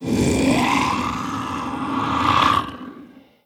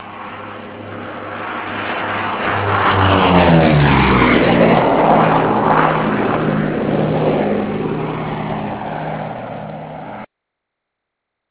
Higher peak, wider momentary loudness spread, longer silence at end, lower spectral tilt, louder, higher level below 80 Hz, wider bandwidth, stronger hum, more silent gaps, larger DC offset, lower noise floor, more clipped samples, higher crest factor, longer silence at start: about the same, -2 dBFS vs 0 dBFS; second, 11 LU vs 18 LU; second, 0.25 s vs 1.25 s; second, -4.5 dB/octave vs -10.5 dB/octave; second, -20 LUFS vs -15 LUFS; second, -40 dBFS vs -34 dBFS; first, 17.5 kHz vs 4 kHz; neither; neither; neither; second, -44 dBFS vs -78 dBFS; neither; about the same, 18 dB vs 16 dB; about the same, 0 s vs 0 s